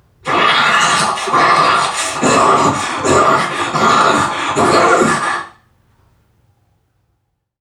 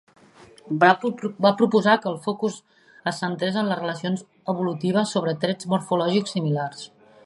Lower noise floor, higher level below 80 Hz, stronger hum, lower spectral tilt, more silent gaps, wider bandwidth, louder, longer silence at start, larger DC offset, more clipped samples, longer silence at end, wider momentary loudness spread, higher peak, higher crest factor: first, -67 dBFS vs -50 dBFS; first, -50 dBFS vs -72 dBFS; neither; second, -3 dB/octave vs -5.5 dB/octave; neither; first, 16 kHz vs 11.5 kHz; first, -12 LUFS vs -23 LUFS; second, 0.25 s vs 0.65 s; neither; neither; first, 2.1 s vs 0.4 s; second, 6 LU vs 12 LU; about the same, 0 dBFS vs -2 dBFS; second, 14 dB vs 22 dB